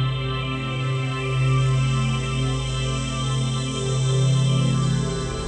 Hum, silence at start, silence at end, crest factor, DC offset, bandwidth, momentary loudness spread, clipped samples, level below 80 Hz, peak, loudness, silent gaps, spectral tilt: none; 0 s; 0 s; 12 dB; under 0.1%; 9.6 kHz; 6 LU; under 0.1%; -36 dBFS; -10 dBFS; -23 LUFS; none; -5.5 dB/octave